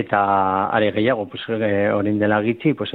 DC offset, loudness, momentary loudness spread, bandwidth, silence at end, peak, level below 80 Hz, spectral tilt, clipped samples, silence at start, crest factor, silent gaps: under 0.1%; -19 LUFS; 4 LU; 4.4 kHz; 0 s; -4 dBFS; -58 dBFS; -9.5 dB/octave; under 0.1%; 0 s; 16 dB; none